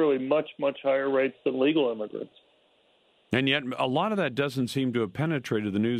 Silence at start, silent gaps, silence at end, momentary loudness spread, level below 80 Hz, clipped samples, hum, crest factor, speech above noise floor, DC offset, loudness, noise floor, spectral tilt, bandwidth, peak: 0 s; none; 0 s; 5 LU; -68 dBFS; under 0.1%; none; 18 dB; 38 dB; under 0.1%; -27 LUFS; -65 dBFS; -6.5 dB/octave; 14.5 kHz; -8 dBFS